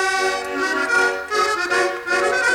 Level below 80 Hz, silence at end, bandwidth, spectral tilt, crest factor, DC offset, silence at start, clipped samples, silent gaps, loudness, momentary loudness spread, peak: -56 dBFS; 0 s; 17.5 kHz; -1 dB/octave; 12 dB; under 0.1%; 0 s; under 0.1%; none; -19 LUFS; 4 LU; -8 dBFS